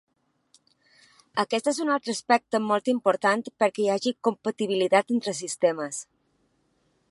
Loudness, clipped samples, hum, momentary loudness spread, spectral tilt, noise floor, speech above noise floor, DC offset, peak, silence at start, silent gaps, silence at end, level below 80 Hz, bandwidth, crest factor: -25 LUFS; under 0.1%; none; 7 LU; -3.5 dB/octave; -69 dBFS; 45 dB; under 0.1%; -6 dBFS; 1.35 s; none; 1.05 s; -78 dBFS; 11.5 kHz; 20 dB